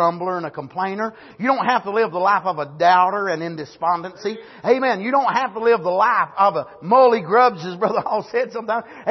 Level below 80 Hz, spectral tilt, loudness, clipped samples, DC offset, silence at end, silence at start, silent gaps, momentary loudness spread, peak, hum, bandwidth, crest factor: -68 dBFS; -6 dB/octave; -19 LUFS; under 0.1%; under 0.1%; 0 s; 0 s; none; 12 LU; -4 dBFS; none; 6.2 kHz; 16 dB